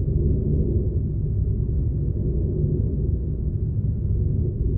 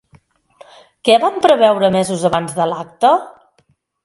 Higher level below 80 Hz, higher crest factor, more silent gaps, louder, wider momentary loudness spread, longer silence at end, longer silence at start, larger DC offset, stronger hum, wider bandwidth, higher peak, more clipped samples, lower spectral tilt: first, -26 dBFS vs -56 dBFS; about the same, 12 dB vs 16 dB; neither; second, -24 LUFS vs -14 LUFS; second, 3 LU vs 8 LU; second, 0 s vs 0.75 s; second, 0 s vs 1.05 s; neither; neither; second, 1.2 kHz vs 11.5 kHz; second, -10 dBFS vs 0 dBFS; neither; first, -16 dB/octave vs -4.5 dB/octave